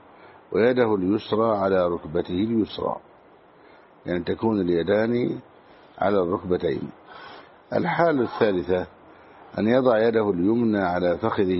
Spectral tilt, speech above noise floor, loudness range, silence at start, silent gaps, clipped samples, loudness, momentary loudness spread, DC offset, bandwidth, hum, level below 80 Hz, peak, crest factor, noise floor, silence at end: -5.5 dB/octave; 30 dB; 4 LU; 0.25 s; none; under 0.1%; -23 LUFS; 13 LU; under 0.1%; 5.8 kHz; none; -56 dBFS; -6 dBFS; 18 dB; -52 dBFS; 0 s